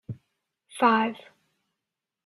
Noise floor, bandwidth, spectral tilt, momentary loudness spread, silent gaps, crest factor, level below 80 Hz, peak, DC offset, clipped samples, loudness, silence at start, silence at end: -87 dBFS; 12 kHz; -5.5 dB/octave; 23 LU; none; 22 dB; -72 dBFS; -6 dBFS; under 0.1%; under 0.1%; -24 LUFS; 0.1 s; 1.1 s